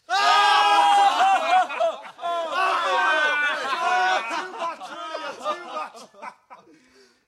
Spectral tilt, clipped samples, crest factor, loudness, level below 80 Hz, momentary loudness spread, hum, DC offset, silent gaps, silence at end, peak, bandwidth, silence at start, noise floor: 0.5 dB/octave; under 0.1%; 16 dB; -21 LUFS; -84 dBFS; 17 LU; none; under 0.1%; none; 0.75 s; -6 dBFS; 13.5 kHz; 0.1 s; -57 dBFS